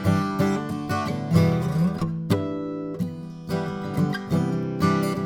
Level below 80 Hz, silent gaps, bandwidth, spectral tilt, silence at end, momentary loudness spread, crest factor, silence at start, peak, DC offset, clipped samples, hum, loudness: -52 dBFS; none; 17 kHz; -7.5 dB/octave; 0 s; 9 LU; 18 dB; 0 s; -6 dBFS; under 0.1%; under 0.1%; none; -25 LUFS